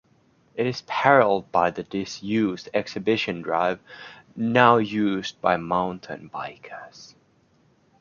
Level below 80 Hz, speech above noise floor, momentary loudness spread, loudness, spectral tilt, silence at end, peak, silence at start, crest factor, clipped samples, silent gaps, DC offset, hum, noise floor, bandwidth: -62 dBFS; 38 dB; 22 LU; -23 LUFS; -6 dB/octave; 0.95 s; -2 dBFS; 0.55 s; 22 dB; under 0.1%; none; under 0.1%; none; -62 dBFS; 7.2 kHz